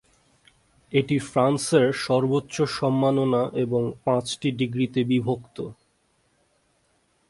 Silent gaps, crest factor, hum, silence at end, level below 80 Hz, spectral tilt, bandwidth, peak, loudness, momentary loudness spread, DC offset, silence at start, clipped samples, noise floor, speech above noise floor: none; 18 dB; none; 1.55 s; -60 dBFS; -6 dB/octave; 11.5 kHz; -6 dBFS; -24 LUFS; 7 LU; under 0.1%; 0.9 s; under 0.1%; -67 dBFS; 44 dB